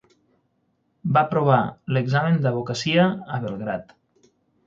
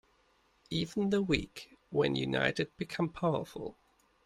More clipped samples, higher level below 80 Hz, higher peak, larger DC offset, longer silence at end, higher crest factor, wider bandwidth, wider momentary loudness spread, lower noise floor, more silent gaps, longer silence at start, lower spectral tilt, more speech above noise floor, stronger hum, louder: neither; about the same, -60 dBFS vs -58 dBFS; first, -4 dBFS vs -12 dBFS; neither; first, 0.85 s vs 0.55 s; about the same, 20 dB vs 22 dB; second, 7.6 kHz vs 14 kHz; second, 10 LU vs 14 LU; about the same, -69 dBFS vs -70 dBFS; neither; first, 1.05 s vs 0.7 s; about the same, -6.5 dB/octave vs -6 dB/octave; first, 48 dB vs 37 dB; neither; first, -22 LUFS vs -33 LUFS